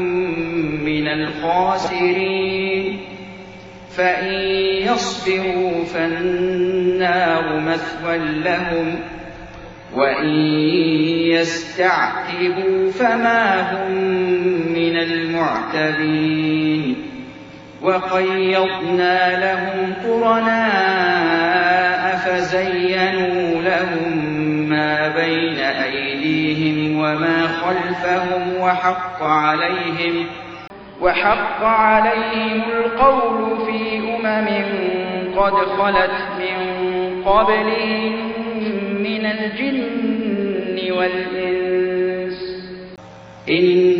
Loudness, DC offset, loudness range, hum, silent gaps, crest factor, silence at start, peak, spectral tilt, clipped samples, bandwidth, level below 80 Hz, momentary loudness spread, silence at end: -18 LUFS; under 0.1%; 4 LU; none; none; 18 dB; 0 s; 0 dBFS; -5.5 dB/octave; under 0.1%; 7.8 kHz; -48 dBFS; 8 LU; 0 s